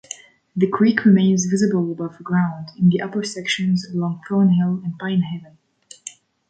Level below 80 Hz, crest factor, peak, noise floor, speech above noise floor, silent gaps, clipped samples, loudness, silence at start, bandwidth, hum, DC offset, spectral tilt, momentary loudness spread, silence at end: -62 dBFS; 16 dB; -2 dBFS; -41 dBFS; 23 dB; none; under 0.1%; -19 LUFS; 0.55 s; 9.2 kHz; none; under 0.1%; -6 dB/octave; 19 LU; 0.4 s